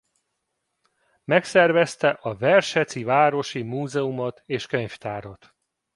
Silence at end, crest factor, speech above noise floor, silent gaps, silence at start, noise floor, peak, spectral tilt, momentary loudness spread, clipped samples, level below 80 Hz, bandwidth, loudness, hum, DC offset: 0.6 s; 20 dB; 55 dB; none; 1.3 s; -78 dBFS; -4 dBFS; -5 dB/octave; 13 LU; under 0.1%; -64 dBFS; 11.5 kHz; -22 LUFS; none; under 0.1%